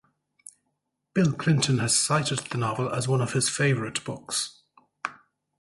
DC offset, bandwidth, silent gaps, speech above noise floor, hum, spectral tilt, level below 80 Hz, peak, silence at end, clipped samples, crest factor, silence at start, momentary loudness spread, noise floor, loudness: under 0.1%; 11.5 kHz; none; 53 dB; none; -4 dB/octave; -60 dBFS; -8 dBFS; 0.5 s; under 0.1%; 18 dB; 1.15 s; 13 LU; -79 dBFS; -25 LUFS